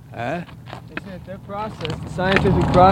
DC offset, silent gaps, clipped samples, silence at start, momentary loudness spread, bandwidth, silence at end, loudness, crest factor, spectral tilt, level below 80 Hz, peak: under 0.1%; none; under 0.1%; 0 s; 19 LU; 15.5 kHz; 0 s; -21 LUFS; 20 dB; -7 dB/octave; -36 dBFS; 0 dBFS